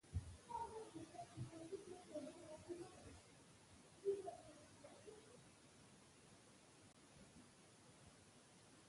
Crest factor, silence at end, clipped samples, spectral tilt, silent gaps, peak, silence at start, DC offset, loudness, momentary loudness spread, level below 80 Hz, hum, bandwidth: 22 dB; 0 s; under 0.1%; -5.5 dB/octave; none; -34 dBFS; 0.05 s; under 0.1%; -56 LUFS; 16 LU; -68 dBFS; none; 11.5 kHz